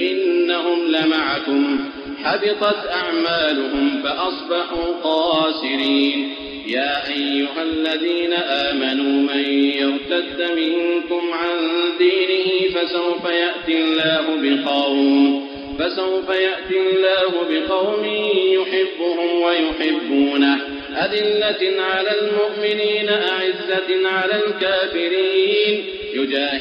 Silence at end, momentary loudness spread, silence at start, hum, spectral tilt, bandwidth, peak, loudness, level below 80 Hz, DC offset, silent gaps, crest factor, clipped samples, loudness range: 0 s; 5 LU; 0 s; none; -5.5 dB/octave; 6 kHz; -4 dBFS; -19 LUFS; -52 dBFS; under 0.1%; none; 14 dB; under 0.1%; 2 LU